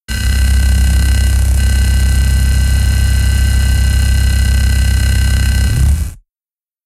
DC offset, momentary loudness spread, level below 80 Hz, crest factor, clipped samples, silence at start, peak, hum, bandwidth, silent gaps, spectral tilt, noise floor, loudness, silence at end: under 0.1%; 1 LU; -12 dBFS; 10 dB; under 0.1%; 0.1 s; -2 dBFS; none; 14.5 kHz; none; -4.5 dB/octave; under -90 dBFS; -13 LUFS; 0.7 s